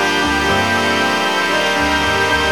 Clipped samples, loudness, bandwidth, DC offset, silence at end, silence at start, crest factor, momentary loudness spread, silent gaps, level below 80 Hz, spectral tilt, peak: under 0.1%; -15 LUFS; 19 kHz; 0.8%; 0 s; 0 s; 14 dB; 1 LU; none; -36 dBFS; -3 dB/octave; -2 dBFS